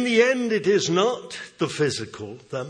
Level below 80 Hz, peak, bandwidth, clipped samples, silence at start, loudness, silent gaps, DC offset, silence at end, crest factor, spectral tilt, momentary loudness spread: -66 dBFS; -4 dBFS; 10 kHz; under 0.1%; 0 s; -23 LUFS; none; under 0.1%; 0 s; 18 dB; -4.5 dB/octave; 16 LU